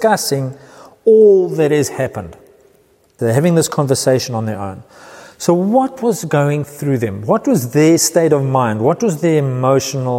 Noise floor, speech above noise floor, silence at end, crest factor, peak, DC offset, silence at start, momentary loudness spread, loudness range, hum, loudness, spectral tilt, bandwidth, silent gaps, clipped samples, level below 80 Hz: -53 dBFS; 39 dB; 0 s; 14 dB; 0 dBFS; under 0.1%; 0 s; 11 LU; 4 LU; none; -14 LUFS; -5.5 dB/octave; 16.5 kHz; none; under 0.1%; -56 dBFS